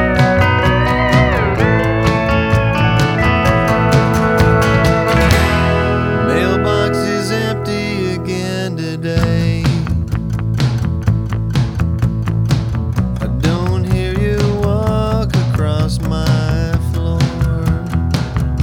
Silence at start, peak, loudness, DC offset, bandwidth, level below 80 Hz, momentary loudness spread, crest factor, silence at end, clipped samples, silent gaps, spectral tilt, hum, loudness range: 0 s; 0 dBFS; -15 LUFS; under 0.1%; 16.5 kHz; -24 dBFS; 6 LU; 14 dB; 0 s; under 0.1%; none; -6.5 dB/octave; none; 5 LU